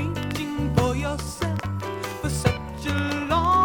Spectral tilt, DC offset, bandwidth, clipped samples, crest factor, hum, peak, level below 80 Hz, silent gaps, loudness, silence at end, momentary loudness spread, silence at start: -5.5 dB/octave; under 0.1%; over 20 kHz; under 0.1%; 18 dB; none; -6 dBFS; -38 dBFS; none; -26 LUFS; 0 s; 7 LU; 0 s